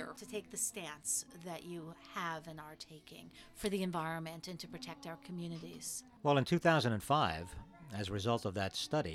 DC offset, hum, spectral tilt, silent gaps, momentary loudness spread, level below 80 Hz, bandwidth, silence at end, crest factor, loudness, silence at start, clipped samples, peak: under 0.1%; none; -4 dB/octave; none; 18 LU; -64 dBFS; 16.5 kHz; 0 s; 22 dB; -38 LUFS; 0 s; under 0.1%; -16 dBFS